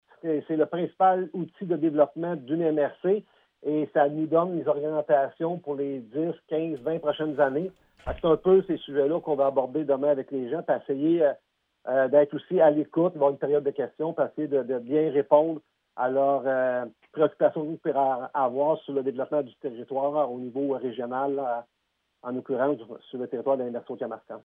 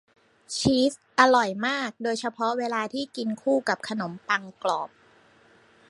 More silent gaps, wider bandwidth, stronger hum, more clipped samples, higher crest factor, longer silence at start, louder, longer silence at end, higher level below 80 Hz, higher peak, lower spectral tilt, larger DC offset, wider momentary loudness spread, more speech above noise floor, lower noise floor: neither; second, 3.8 kHz vs 11.5 kHz; neither; neither; about the same, 20 dB vs 24 dB; second, 0.25 s vs 0.5 s; about the same, -26 LUFS vs -26 LUFS; second, 0.05 s vs 1.05 s; about the same, -58 dBFS vs -58 dBFS; second, -6 dBFS vs -2 dBFS; first, -10 dB/octave vs -4 dB/octave; neither; about the same, 12 LU vs 11 LU; first, 51 dB vs 32 dB; first, -76 dBFS vs -58 dBFS